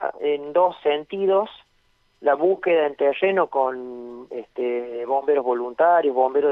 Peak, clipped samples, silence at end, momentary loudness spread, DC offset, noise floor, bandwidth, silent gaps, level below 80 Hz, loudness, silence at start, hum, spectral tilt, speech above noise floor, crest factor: -6 dBFS; under 0.1%; 0 s; 14 LU; under 0.1%; -63 dBFS; 4.9 kHz; none; -68 dBFS; -21 LUFS; 0 s; none; -7.5 dB/octave; 42 dB; 16 dB